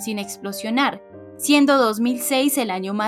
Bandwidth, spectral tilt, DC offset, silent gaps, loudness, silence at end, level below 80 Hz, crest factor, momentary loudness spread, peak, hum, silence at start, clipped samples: 16 kHz; -3 dB/octave; under 0.1%; none; -20 LUFS; 0 s; -68 dBFS; 16 dB; 13 LU; -4 dBFS; none; 0 s; under 0.1%